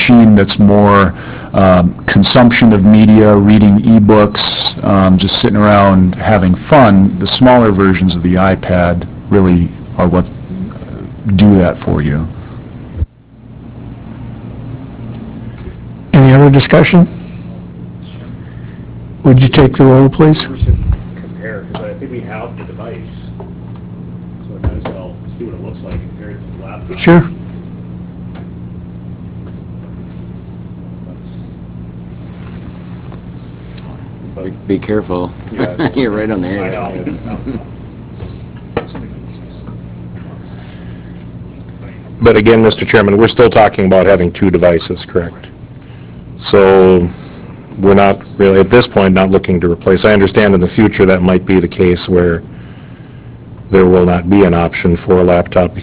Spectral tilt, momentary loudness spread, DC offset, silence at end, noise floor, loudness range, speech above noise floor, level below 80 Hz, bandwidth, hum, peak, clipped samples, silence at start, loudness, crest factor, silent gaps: -11.5 dB/octave; 23 LU; under 0.1%; 0 s; -36 dBFS; 20 LU; 28 dB; -28 dBFS; 4 kHz; none; 0 dBFS; 1%; 0 s; -9 LUFS; 10 dB; none